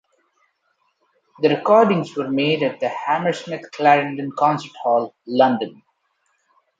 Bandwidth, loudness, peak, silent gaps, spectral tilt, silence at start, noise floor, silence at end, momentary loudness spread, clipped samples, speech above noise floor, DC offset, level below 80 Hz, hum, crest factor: 7.8 kHz; -19 LUFS; -2 dBFS; none; -6.5 dB/octave; 1.4 s; -68 dBFS; 1.05 s; 10 LU; under 0.1%; 49 dB; under 0.1%; -72 dBFS; none; 18 dB